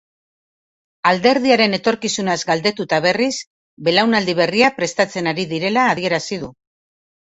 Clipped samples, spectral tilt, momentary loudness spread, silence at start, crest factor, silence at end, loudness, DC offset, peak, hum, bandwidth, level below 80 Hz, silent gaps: under 0.1%; -4 dB/octave; 7 LU; 1.05 s; 18 dB; 0.75 s; -17 LUFS; under 0.1%; 0 dBFS; none; 8.2 kHz; -58 dBFS; 3.47-3.77 s